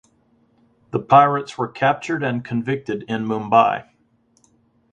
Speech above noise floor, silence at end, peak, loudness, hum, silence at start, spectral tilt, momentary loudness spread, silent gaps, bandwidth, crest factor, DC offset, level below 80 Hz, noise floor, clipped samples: 42 dB; 1.1 s; 0 dBFS; -19 LUFS; none; 0.95 s; -7 dB/octave; 14 LU; none; 9 kHz; 20 dB; under 0.1%; -62 dBFS; -61 dBFS; under 0.1%